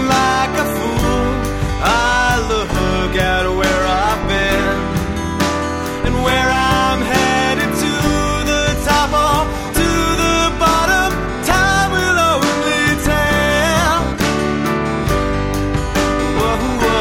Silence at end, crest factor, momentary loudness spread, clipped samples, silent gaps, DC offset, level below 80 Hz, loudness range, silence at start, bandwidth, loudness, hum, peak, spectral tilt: 0 s; 14 dB; 5 LU; under 0.1%; none; under 0.1%; -26 dBFS; 2 LU; 0 s; 18 kHz; -15 LUFS; none; 0 dBFS; -4 dB/octave